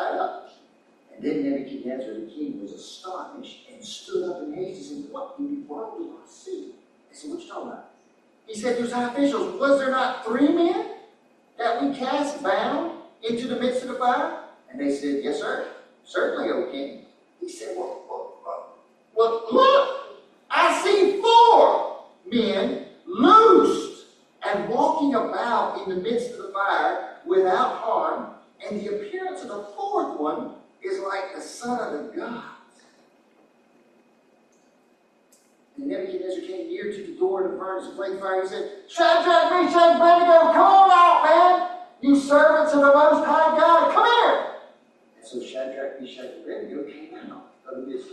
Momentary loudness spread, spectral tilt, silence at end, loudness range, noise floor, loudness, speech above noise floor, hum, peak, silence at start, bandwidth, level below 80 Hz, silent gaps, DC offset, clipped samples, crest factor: 22 LU; -4 dB/octave; 0.05 s; 18 LU; -61 dBFS; -21 LUFS; 39 dB; none; -4 dBFS; 0 s; 11.5 kHz; -72 dBFS; none; under 0.1%; under 0.1%; 18 dB